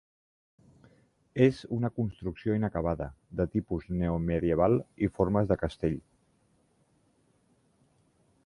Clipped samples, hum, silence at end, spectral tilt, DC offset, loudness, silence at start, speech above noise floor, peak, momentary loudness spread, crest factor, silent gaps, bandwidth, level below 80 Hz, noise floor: under 0.1%; none; 2.45 s; -9 dB/octave; under 0.1%; -30 LUFS; 1.35 s; 40 dB; -10 dBFS; 8 LU; 22 dB; none; 11 kHz; -48 dBFS; -69 dBFS